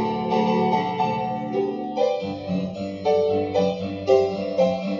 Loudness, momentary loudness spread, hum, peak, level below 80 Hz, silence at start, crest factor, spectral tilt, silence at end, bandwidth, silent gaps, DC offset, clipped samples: -23 LUFS; 7 LU; none; -6 dBFS; -58 dBFS; 0 s; 18 dB; -7 dB/octave; 0 s; 7.4 kHz; none; under 0.1%; under 0.1%